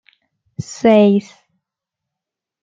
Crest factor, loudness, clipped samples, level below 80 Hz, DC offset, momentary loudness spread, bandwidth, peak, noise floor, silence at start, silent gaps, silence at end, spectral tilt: 16 dB; -13 LUFS; under 0.1%; -60 dBFS; under 0.1%; 21 LU; 7.6 kHz; -2 dBFS; -84 dBFS; 0.6 s; none; 1.4 s; -6.5 dB/octave